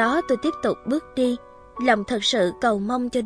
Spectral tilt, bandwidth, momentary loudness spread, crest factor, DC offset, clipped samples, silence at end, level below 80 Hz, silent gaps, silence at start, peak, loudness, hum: -4 dB/octave; 11 kHz; 6 LU; 18 dB; under 0.1%; under 0.1%; 0 s; -54 dBFS; none; 0 s; -4 dBFS; -23 LUFS; none